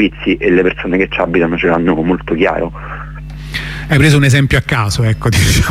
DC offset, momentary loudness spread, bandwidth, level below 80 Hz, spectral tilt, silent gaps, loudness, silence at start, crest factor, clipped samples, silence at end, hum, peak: under 0.1%; 13 LU; 15.5 kHz; -26 dBFS; -5.5 dB/octave; none; -13 LUFS; 0 s; 12 dB; under 0.1%; 0 s; none; 0 dBFS